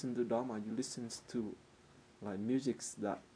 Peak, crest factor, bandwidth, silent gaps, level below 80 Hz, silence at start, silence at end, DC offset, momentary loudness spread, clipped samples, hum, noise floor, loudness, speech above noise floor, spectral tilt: -22 dBFS; 18 dB; 11 kHz; none; -76 dBFS; 0 s; 0.1 s; under 0.1%; 10 LU; under 0.1%; none; -63 dBFS; -40 LUFS; 24 dB; -5 dB/octave